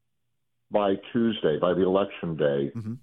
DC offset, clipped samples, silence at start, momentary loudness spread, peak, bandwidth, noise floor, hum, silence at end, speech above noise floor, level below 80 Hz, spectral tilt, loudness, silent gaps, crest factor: under 0.1%; under 0.1%; 0.7 s; 6 LU; -8 dBFS; 4.1 kHz; -82 dBFS; none; 0.05 s; 57 dB; -60 dBFS; -9 dB/octave; -26 LUFS; none; 18 dB